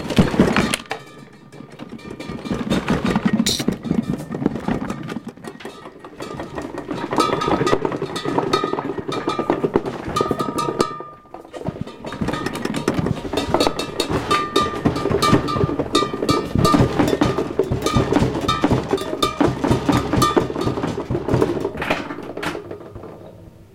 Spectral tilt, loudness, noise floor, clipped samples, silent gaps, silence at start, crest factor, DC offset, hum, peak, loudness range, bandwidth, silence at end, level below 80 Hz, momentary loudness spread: -5.5 dB/octave; -21 LUFS; -42 dBFS; under 0.1%; none; 0 s; 20 dB; under 0.1%; none; 0 dBFS; 6 LU; 17 kHz; 0.1 s; -38 dBFS; 17 LU